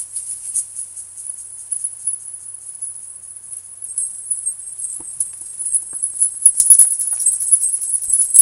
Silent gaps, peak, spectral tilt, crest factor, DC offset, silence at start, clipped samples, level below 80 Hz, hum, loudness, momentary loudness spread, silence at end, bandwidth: none; 0 dBFS; 2.5 dB/octave; 18 dB; under 0.1%; 0 s; 0.1%; -64 dBFS; none; -15 LUFS; 20 LU; 0 s; 17 kHz